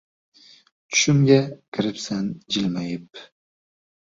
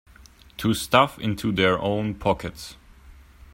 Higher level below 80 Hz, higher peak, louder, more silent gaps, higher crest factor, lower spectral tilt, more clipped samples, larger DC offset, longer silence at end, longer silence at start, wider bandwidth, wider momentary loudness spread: second, -60 dBFS vs -48 dBFS; about the same, -2 dBFS vs -2 dBFS; about the same, -22 LUFS vs -23 LUFS; first, 1.68-1.72 s vs none; about the same, 22 dB vs 22 dB; about the same, -4.5 dB/octave vs -5 dB/octave; neither; neither; first, 0.9 s vs 0.4 s; first, 0.9 s vs 0.6 s; second, 7.8 kHz vs 16.5 kHz; second, 14 LU vs 19 LU